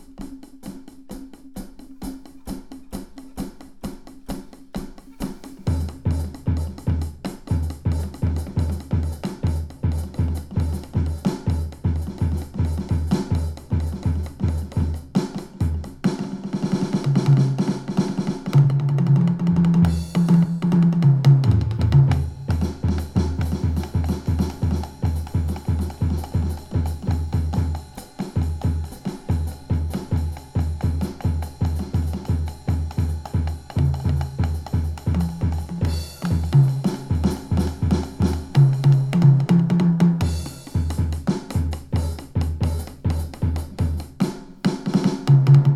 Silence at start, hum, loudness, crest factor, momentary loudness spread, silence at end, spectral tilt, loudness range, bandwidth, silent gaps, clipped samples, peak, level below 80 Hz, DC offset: 0 s; none; -22 LUFS; 18 dB; 18 LU; 0 s; -8 dB/octave; 9 LU; 13.5 kHz; none; under 0.1%; -4 dBFS; -34 dBFS; under 0.1%